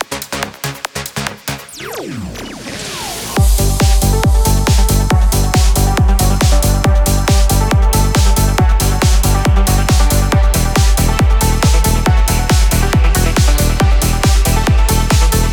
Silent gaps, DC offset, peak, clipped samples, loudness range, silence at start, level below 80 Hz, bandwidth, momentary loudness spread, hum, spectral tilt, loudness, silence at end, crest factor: none; under 0.1%; -2 dBFS; under 0.1%; 4 LU; 0 s; -14 dBFS; over 20 kHz; 10 LU; none; -4.5 dB/octave; -13 LUFS; 0 s; 10 dB